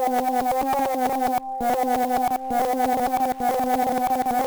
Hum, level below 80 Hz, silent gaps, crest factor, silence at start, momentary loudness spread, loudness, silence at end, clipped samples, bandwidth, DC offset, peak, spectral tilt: none; -52 dBFS; none; 10 dB; 0 s; 2 LU; -23 LUFS; 0 s; under 0.1%; over 20 kHz; under 0.1%; -12 dBFS; -4 dB/octave